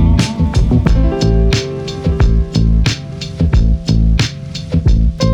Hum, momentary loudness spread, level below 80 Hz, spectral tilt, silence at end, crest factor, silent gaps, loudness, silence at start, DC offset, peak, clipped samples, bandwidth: none; 6 LU; -14 dBFS; -6.5 dB/octave; 0 s; 12 dB; none; -14 LUFS; 0 s; under 0.1%; 0 dBFS; under 0.1%; 10 kHz